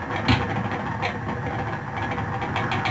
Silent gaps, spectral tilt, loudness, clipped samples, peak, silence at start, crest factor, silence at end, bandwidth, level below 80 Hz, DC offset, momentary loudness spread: none; -6.5 dB/octave; -26 LUFS; under 0.1%; -6 dBFS; 0 s; 20 dB; 0 s; 8 kHz; -42 dBFS; under 0.1%; 7 LU